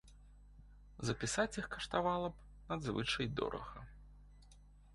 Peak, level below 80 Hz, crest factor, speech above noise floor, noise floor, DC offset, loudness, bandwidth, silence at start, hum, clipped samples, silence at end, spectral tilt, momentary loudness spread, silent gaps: -20 dBFS; -58 dBFS; 22 dB; 22 dB; -61 dBFS; under 0.1%; -39 LUFS; 11.5 kHz; 0.05 s; 50 Hz at -55 dBFS; under 0.1%; 0 s; -4 dB/octave; 18 LU; none